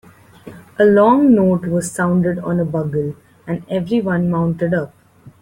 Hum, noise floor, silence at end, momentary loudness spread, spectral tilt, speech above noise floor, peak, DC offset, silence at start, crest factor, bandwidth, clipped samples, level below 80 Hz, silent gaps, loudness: none; -40 dBFS; 0.15 s; 15 LU; -7.5 dB/octave; 24 dB; -2 dBFS; under 0.1%; 0.45 s; 14 dB; 13 kHz; under 0.1%; -52 dBFS; none; -16 LUFS